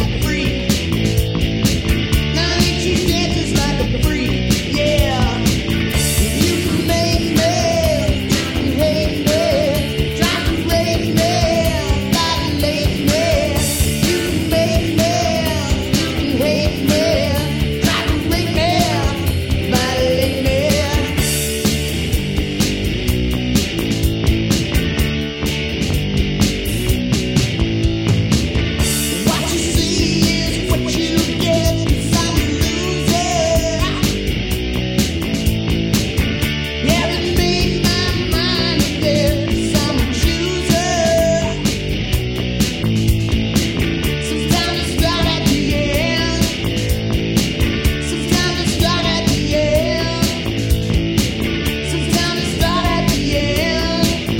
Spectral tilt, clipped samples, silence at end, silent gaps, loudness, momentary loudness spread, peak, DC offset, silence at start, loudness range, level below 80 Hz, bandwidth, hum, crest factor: -4.5 dB/octave; under 0.1%; 0 s; none; -17 LUFS; 3 LU; 0 dBFS; 0.2%; 0 s; 2 LU; -24 dBFS; 17 kHz; none; 16 dB